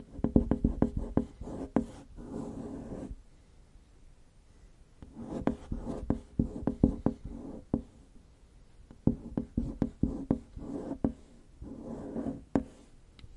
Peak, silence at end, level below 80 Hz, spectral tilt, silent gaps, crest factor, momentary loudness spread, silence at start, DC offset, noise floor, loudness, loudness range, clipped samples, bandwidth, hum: -8 dBFS; 0 s; -44 dBFS; -9.5 dB/octave; none; 28 dB; 17 LU; 0 s; under 0.1%; -58 dBFS; -35 LUFS; 8 LU; under 0.1%; 11 kHz; none